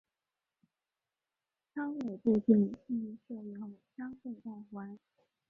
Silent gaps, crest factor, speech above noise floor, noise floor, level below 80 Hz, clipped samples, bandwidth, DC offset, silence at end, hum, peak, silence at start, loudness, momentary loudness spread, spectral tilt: none; 22 dB; over 56 dB; under -90 dBFS; -76 dBFS; under 0.1%; 2.9 kHz; under 0.1%; 0.55 s; none; -14 dBFS; 1.75 s; -33 LUFS; 19 LU; -10 dB/octave